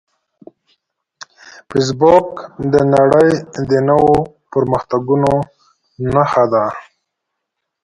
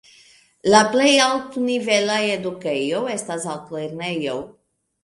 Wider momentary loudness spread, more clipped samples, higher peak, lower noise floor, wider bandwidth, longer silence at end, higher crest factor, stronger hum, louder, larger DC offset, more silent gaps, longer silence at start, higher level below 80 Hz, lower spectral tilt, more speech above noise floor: about the same, 12 LU vs 14 LU; neither; about the same, 0 dBFS vs 0 dBFS; first, -76 dBFS vs -53 dBFS; about the same, 11.5 kHz vs 11.5 kHz; first, 1 s vs 0.55 s; about the same, 16 dB vs 20 dB; neither; first, -14 LUFS vs -20 LUFS; neither; neither; first, 1.7 s vs 0.65 s; first, -46 dBFS vs -62 dBFS; first, -7 dB/octave vs -3 dB/octave; first, 63 dB vs 33 dB